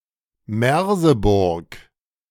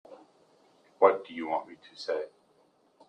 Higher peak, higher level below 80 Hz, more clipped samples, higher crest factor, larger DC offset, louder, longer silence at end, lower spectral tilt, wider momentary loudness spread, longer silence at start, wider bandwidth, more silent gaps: about the same, -4 dBFS vs -6 dBFS; first, -36 dBFS vs -84 dBFS; neither; second, 16 dB vs 26 dB; neither; first, -18 LUFS vs -29 LUFS; second, 0.5 s vs 0.8 s; first, -6.5 dB/octave vs -4.5 dB/octave; second, 11 LU vs 18 LU; first, 0.5 s vs 0.1 s; first, 19 kHz vs 9.2 kHz; neither